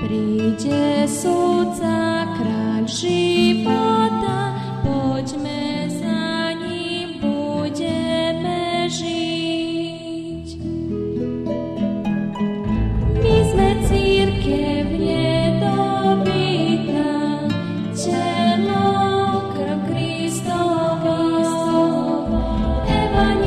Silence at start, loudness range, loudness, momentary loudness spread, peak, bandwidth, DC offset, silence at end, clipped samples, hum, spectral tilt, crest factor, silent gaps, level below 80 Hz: 0 s; 5 LU; -20 LUFS; 7 LU; -4 dBFS; 13.5 kHz; under 0.1%; 0 s; under 0.1%; none; -6 dB/octave; 14 dB; none; -32 dBFS